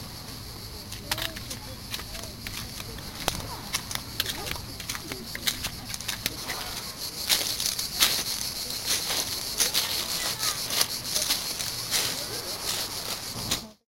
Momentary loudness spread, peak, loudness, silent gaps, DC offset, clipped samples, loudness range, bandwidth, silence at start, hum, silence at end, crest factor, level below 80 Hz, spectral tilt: 13 LU; -4 dBFS; -28 LUFS; none; under 0.1%; under 0.1%; 8 LU; 17 kHz; 0 s; none; 0.15 s; 28 dB; -48 dBFS; -1 dB/octave